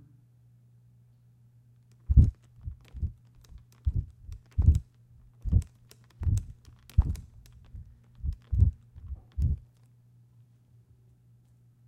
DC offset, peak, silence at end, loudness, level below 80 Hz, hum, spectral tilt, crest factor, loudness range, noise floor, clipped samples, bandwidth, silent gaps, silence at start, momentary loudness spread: under 0.1%; -6 dBFS; 2.3 s; -30 LUFS; -34 dBFS; none; -9 dB/octave; 24 dB; 4 LU; -60 dBFS; under 0.1%; 8.6 kHz; none; 2.1 s; 24 LU